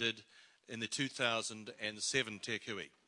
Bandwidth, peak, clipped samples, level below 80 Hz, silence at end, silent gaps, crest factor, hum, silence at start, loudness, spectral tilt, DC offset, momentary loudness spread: 11.5 kHz; -18 dBFS; under 0.1%; -80 dBFS; 0.2 s; none; 22 dB; none; 0 s; -38 LUFS; -2 dB/octave; under 0.1%; 9 LU